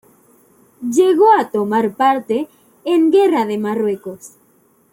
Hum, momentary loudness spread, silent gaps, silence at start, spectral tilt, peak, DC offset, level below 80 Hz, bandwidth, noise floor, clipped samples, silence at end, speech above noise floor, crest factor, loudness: none; 17 LU; none; 0.8 s; -5.5 dB/octave; -2 dBFS; under 0.1%; -68 dBFS; 16.5 kHz; -55 dBFS; under 0.1%; 0.65 s; 40 dB; 14 dB; -15 LUFS